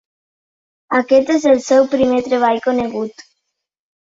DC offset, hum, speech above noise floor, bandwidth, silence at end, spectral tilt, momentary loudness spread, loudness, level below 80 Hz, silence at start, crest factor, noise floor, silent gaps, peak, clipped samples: under 0.1%; none; 60 dB; 7.8 kHz; 0.9 s; -4.5 dB/octave; 9 LU; -15 LUFS; -56 dBFS; 0.9 s; 16 dB; -75 dBFS; none; -2 dBFS; under 0.1%